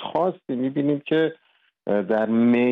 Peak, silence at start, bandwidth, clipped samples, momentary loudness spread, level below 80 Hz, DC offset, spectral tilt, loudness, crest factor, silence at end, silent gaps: -10 dBFS; 0 s; 4 kHz; under 0.1%; 8 LU; -70 dBFS; under 0.1%; -9 dB/octave; -23 LUFS; 12 dB; 0 s; none